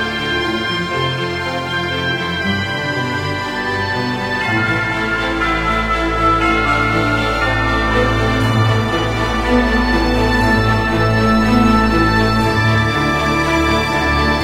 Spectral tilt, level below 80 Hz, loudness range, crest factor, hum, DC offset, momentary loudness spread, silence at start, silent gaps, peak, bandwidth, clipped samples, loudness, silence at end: -5.5 dB/octave; -26 dBFS; 5 LU; 14 dB; none; under 0.1%; 5 LU; 0 s; none; -2 dBFS; 16 kHz; under 0.1%; -15 LUFS; 0 s